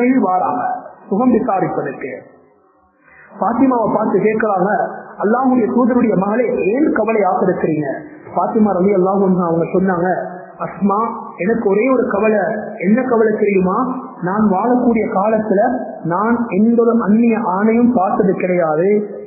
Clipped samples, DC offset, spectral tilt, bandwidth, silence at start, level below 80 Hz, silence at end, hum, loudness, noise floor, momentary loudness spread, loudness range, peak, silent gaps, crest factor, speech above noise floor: under 0.1%; under 0.1%; -16.5 dB/octave; 2.7 kHz; 0 s; -52 dBFS; 0 s; none; -15 LUFS; -53 dBFS; 9 LU; 4 LU; 0 dBFS; none; 14 dB; 39 dB